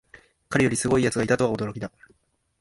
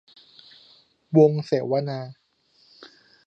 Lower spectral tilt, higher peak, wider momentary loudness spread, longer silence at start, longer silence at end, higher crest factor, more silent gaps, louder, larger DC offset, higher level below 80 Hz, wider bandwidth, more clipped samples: second, -5 dB/octave vs -9 dB/octave; about the same, -6 dBFS vs -4 dBFS; second, 12 LU vs 16 LU; second, 0.5 s vs 1.1 s; first, 0.7 s vs 0.4 s; about the same, 20 dB vs 22 dB; neither; about the same, -23 LUFS vs -22 LUFS; neither; first, -52 dBFS vs -74 dBFS; first, 11.5 kHz vs 6.6 kHz; neither